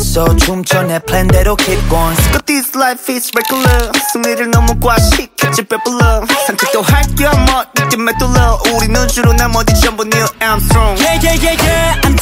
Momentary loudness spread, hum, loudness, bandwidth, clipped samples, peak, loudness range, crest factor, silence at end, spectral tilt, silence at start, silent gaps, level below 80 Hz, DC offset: 3 LU; none; -11 LUFS; 16.5 kHz; under 0.1%; 0 dBFS; 1 LU; 10 dB; 0 s; -4 dB/octave; 0 s; none; -16 dBFS; under 0.1%